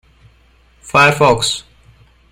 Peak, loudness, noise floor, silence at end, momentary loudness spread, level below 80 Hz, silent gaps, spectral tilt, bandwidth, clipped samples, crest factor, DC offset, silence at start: 0 dBFS; -13 LUFS; -51 dBFS; 0.7 s; 9 LU; -46 dBFS; none; -3.5 dB/octave; 16 kHz; under 0.1%; 16 dB; under 0.1%; 0.85 s